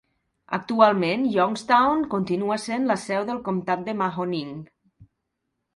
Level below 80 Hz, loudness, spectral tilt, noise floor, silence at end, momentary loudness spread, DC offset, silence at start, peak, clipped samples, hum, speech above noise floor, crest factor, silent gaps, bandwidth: -62 dBFS; -23 LUFS; -6 dB/octave; -79 dBFS; 0.7 s; 11 LU; under 0.1%; 0.5 s; -2 dBFS; under 0.1%; none; 56 dB; 22 dB; none; 11.5 kHz